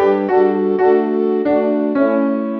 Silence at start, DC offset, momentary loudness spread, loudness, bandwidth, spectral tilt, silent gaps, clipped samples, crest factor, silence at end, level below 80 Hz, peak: 0 s; under 0.1%; 3 LU; -15 LUFS; 5.2 kHz; -9.5 dB/octave; none; under 0.1%; 12 dB; 0 s; -58 dBFS; -2 dBFS